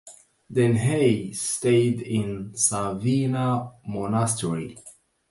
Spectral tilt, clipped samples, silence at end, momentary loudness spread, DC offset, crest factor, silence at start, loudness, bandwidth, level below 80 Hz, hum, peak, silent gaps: -5.5 dB/octave; under 0.1%; 0.4 s; 10 LU; under 0.1%; 20 dB; 0.05 s; -24 LUFS; 11.5 kHz; -56 dBFS; none; -6 dBFS; none